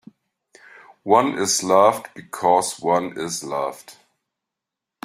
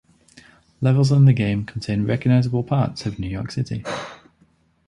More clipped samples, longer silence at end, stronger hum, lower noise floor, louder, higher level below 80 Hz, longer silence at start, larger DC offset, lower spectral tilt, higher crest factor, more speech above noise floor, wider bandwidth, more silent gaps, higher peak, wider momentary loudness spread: neither; first, 1.15 s vs 0.75 s; neither; first, -85 dBFS vs -60 dBFS; about the same, -20 LUFS vs -21 LUFS; second, -68 dBFS vs -46 dBFS; first, 1.05 s vs 0.8 s; neither; second, -3 dB/octave vs -7.5 dB/octave; about the same, 20 dB vs 16 dB; first, 65 dB vs 41 dB; first, 16 kHz vs 10 kHz; neither; about the same, -2 dBFS vs -4 dBFS; about the same, 15 LU vs 13 LU